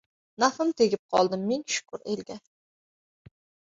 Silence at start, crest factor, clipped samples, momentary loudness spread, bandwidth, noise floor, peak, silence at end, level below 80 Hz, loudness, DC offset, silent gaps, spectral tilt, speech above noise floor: 0.4 s; 22 dB; under 0.1%; 10 LU; 8 kHz; under -90 dBFS; -8 dBFS; 1.4 s; -70 dBFS; -27 LUFS; under 0.1%; 0.99-1.09 s; -4 dB/octave; over 63 dB